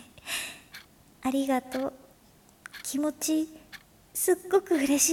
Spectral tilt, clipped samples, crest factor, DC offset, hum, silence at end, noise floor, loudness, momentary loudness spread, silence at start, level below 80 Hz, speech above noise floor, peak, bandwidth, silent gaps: -2 dB/octave; under 0.1%; 20 dB; under 0.1%; none; 0 s; -58 dBFS; -29 LUFS; 23 LU; 0 s; -64 dBFS; 32 dB; -10 dBFS; 18 kHz; none